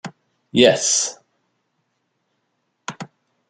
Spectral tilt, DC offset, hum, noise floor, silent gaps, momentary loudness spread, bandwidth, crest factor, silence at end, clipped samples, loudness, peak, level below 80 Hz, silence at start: -2.5 dB/octave; under 0.1%; none; -72 dBFS; none; 24 LU; 11 kHz; 22 dB; 0.45 s; under 0.1%; -17 LUFS; -2 dBFS; -64 dBFS; 0.05 s